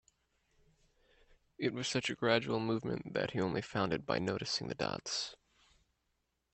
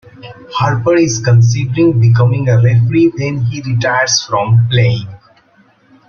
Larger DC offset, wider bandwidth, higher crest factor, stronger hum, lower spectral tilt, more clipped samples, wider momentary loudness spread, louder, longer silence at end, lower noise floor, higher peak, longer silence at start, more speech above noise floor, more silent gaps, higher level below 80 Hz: neither; first, 8.8 kHz vs 7 kHz; first, 24 dB vs 12 dB; neither; about the same, -4.5 dB/octave vs -5.5 dB/octave; neither; about the same, 6 LU vs 7 LU; second, -36 LUFS vs -12 LUFS; first, 1.2 s vs 0.95 s; first, -82 dBFS vs -50 dBFS; second, -14 dBFS vs 0 dBFS; first, 1.6 s vs 0.25 s; first, 47 dB vs 39 dB; neither; second, -68 dBFS vs -44 dBFS